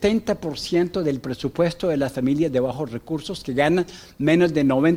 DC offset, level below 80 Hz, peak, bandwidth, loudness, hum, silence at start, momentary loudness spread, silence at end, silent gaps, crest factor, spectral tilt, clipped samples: under 0.1%; -48 dBFS; -4 dBFS; 16 kHz; -22 LUFS; none; 0 s; 10 LU; 0 s; none; 16 dB; -6.5 dB/octave; under 0.1%